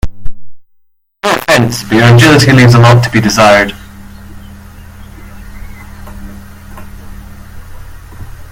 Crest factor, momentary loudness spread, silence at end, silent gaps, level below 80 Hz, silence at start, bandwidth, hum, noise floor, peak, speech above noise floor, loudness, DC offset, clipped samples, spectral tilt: 10 dB; 27 LU; 0 s; none; -30 dBFS; 0.05 s; 16.5 kHz; none; -53 dBFS; 0 dBFS; 48 dB; -6 LUFS; under 0.1%; 1%; -5.5 dB/octave